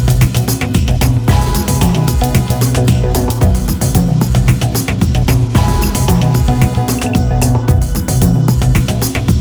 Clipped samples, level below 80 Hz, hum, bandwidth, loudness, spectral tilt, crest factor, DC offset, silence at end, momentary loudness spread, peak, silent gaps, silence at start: under 0.1%; -18 dBFS; none; over 20 kHz; -13 LUFS; -6 dB/octave; 12 dB; under 0.1%; 0 s; 3 LU; 0 dBFS; none; 0 s